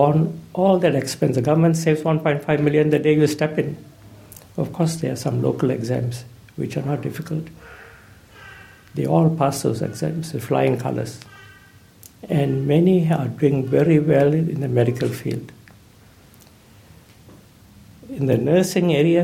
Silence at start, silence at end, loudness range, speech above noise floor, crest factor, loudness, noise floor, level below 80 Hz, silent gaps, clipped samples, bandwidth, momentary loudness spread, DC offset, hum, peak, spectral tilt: 0 s; 0 s; 9 LU; 30 dB; 16 dB; -20 LUFS; -49 dBFS; -56 dBFS; none; under 0.1%; 16 kHz; 13 LU; under 0.1%; none; -4 dBFS; -7 dB/octave